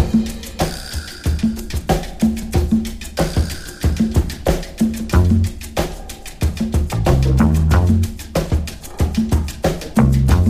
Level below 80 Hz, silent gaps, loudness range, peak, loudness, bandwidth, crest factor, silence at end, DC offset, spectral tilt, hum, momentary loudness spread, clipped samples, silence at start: -22 dBFS; none; 3 LU; -2 dBFS; -19 LUFS; 15.5 kHz; 16 dB; 0 s; under 0.1%; -6.5 dB/octave; none; 10 LU; under 0.1%; 0 s